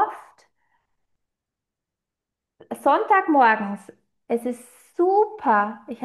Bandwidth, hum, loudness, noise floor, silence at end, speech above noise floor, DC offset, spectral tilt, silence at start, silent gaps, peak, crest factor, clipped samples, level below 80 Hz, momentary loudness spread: 12.5 kHz; none; -21 LUFS; -86 dBFS; 0 s; 65 dB; under 0.1%; -5.5 dB/octave; 0 s; none; -6 dBFS; 18 dB; under 0.1%; -76 dBFS; 19 LU